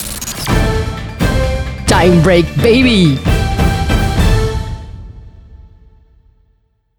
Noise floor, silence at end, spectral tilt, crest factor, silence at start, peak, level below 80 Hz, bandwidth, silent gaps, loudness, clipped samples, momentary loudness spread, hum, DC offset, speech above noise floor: -57 dBFS; 1.3 s; -5.5 dB/octave; 14 dB; 0 s; 0 dBFS; -20 dBFS; over 20 kHz; none; -13 LUFS; under 0.1%; 13 LU; none; under 0.1%; 48 dB